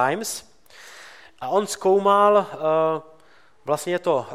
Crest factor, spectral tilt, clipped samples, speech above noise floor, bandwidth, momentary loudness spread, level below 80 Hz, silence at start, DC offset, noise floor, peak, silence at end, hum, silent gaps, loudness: 16 dB; -4 dB/octave; under 0.1%; 35 dB; 16 kHz; 21 LU; -70 dBFS; 0 s; 0.2%; -56 dBFS; -6 dBFS; 0 s; none; none; -21 LUFS